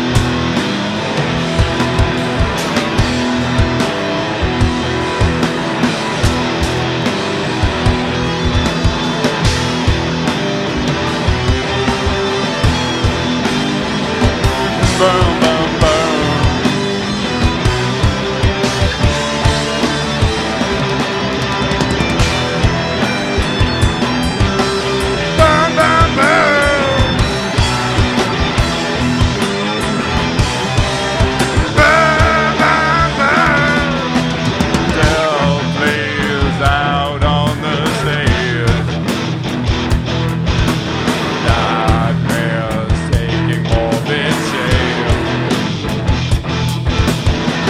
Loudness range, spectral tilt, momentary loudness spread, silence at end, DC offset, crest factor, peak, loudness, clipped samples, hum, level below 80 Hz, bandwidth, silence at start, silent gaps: 4 LU; -5 dB/octave; 5 LU; 0 s; under 0.1%; 14 dB; 0 dBFS; -14 LUFS; under 0.1%; none; -24 dBFS; 15.5 kHz; 0 s; none